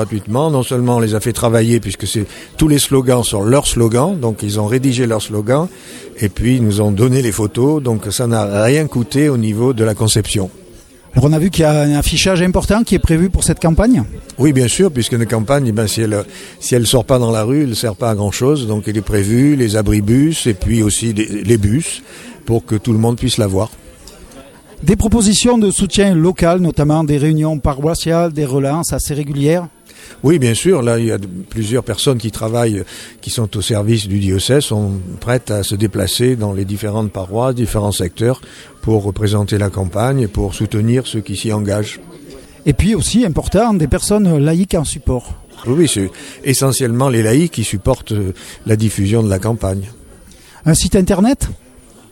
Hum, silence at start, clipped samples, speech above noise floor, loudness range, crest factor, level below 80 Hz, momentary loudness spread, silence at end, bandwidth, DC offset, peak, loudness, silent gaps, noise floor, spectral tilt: none; 0 s; under 0.1%; 26 dB; 4 LU; 14 dB; -30 dBFS; 8 LU; 0.55 s; 17.5 kHz; under 0.1%; 0 dBFS; -15 LUFS; none; -40 dBFS; -5.5 dB/octave